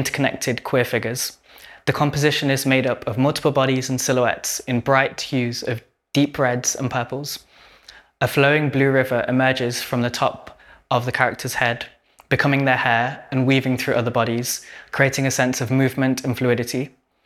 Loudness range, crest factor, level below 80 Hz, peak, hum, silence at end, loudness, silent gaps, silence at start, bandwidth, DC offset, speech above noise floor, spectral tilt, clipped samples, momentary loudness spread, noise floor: 2 LU; 20 dB; -56 dBFS; 0 dBFS; none; 0.35 s; -20 LUFS; none; 0 s; 15.5 kHz; under 0.1%; 28 dB; -4.5 dB/octave; under 0.1%; 9 LU; -48 dBFS